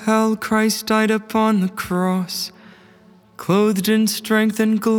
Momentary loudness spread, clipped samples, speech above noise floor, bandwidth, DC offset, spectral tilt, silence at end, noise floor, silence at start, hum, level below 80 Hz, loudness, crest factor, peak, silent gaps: 6 LU; under 0.1%; 32 dB; over 20 kHz; under 0.1%; -5 dB/octave; 0 s; -49 dBFS; 0 s; none; -60 dBFS; -19 LUFS; 16 dB; -2 dBFS; none